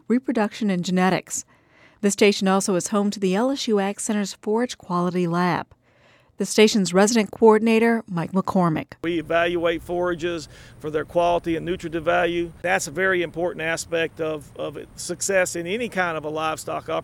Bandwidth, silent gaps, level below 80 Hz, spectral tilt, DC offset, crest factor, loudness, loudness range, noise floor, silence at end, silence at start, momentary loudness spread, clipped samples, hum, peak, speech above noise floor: 16.5 kHz; none; -52 dBFS; -4.5 dB/octave; under 0.1%; 20 dB; -22 LUFS; 5 LU; -57 dBFS; 0 s; 0.1 s; 11 LU; under 0.1%; none; -2 dBFS; 35 dB